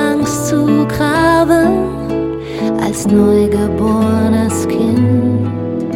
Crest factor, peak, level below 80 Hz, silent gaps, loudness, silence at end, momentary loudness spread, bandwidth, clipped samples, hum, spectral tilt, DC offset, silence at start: 12 dB; 0 dBFS; -34 dBFS; none; -13 LUFS; 0 s; 8 LU; 16.5 kHz; under 0.1%; none; -6.5 dB/octave; under 0.1%; 0 s